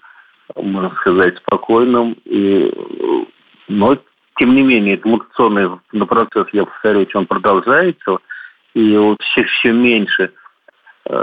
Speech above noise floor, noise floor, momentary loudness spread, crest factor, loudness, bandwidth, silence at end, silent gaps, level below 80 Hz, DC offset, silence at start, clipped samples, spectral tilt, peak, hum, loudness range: 35 dB; -48 dBFS; 10 LU; 12 dB; -14 LUFS; 4.9 kHz; 0 s; none; -54 dBFS; under 0.1%; 0.55 s; under 0.1%; -8.5 dB/octave; -2 dBFS; none; 2 LU